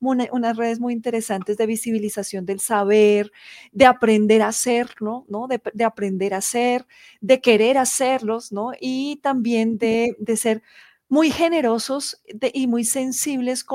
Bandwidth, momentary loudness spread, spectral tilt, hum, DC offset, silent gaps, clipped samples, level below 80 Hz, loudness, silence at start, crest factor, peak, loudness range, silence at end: 16.5 kHz; 11 LU; -3.5 dB/octave; none; under 0.1%; none; under 0.1%; -62 dBFS; -20 LUFS; 0 s; 20 dB; 0 dBFS; 3 LU; 0 s